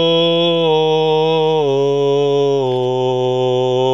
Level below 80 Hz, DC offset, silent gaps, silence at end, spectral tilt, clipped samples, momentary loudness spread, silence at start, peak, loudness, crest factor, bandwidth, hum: -66 dBFS; 0.6%; none; 0 s; -6.5 dB/octave; under 0.1%; 3 LU; 0 s; -4 dBFS; -15 LUFS; 10 dB; 7.6 kHz; none